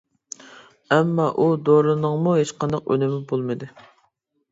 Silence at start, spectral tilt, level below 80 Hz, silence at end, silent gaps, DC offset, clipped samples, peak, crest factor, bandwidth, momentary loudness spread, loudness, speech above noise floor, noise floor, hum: 0.5 s; -7 dB/octave; -62 dBFS; 0.85 s; none; under 0.1%; under 0.1%; -4 dBFS; 18 dB; 7.8 kHz; 21 LU; -21 LUFS; 48 dB; -68 dBFS; none